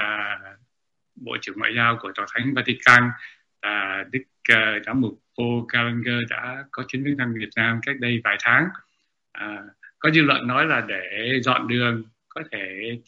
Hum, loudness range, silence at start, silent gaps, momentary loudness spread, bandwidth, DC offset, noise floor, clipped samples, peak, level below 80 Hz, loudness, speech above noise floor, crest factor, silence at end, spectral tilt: none; 3 LU; 0 s; none; 15 LU; 8.2 kHz; under 0.1%; -81 dBFS; under 0.1%; 0 dBFS; -64 dBFS; -21 LUFS; 58 dB; 24 dB; 0.1 s; -5.5 dB/octave